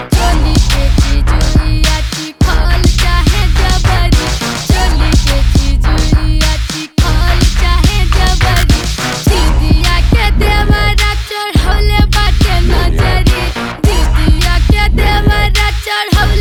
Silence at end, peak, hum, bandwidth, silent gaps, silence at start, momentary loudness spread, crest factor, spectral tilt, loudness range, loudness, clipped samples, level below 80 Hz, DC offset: 0 s; 0 dBFS; none; 18 kHz; none; 0 s; 3 LU; 10 dB; -4.5 dB/octave; 1 LU; -12 LUFS; under 0.1%; -10 dBFS; under 0.1%